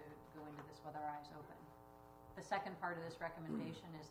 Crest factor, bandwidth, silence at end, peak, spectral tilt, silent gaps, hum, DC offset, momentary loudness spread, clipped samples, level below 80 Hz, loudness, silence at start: 22 dB; 15.5 kHz; 0 s; -28 dBFS; -6 dB/octave; none; none; under 0.1%; 16 LU; under 0.1%; -74 dBFS; -49 LUFS; 0 s